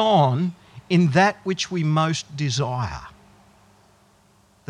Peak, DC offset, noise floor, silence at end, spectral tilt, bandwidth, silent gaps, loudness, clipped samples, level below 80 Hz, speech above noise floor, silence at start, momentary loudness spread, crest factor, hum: -4 dBFS; under 0.1%; -58 dBFS; 1.6 s; -5.5 dB/octave; 10.5 kHz; none; -22 LUFS; under 0.1%; -54 dBFS; 37 dB; 0 s; 11 LU; 18 dB; none